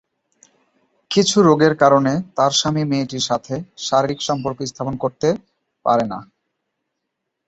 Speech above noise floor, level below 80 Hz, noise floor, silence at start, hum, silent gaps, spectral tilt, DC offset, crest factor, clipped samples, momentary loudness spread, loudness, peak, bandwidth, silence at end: 60 dB; -56 dBFS; -78 dBFS; 1.1 s; none; none; -4.5 dB/octave; under 0.1%; 20 dB; under 0.1%; 12 LU; -18 LUFS; 0 dBFS; 8.2 kHz; 1.25 s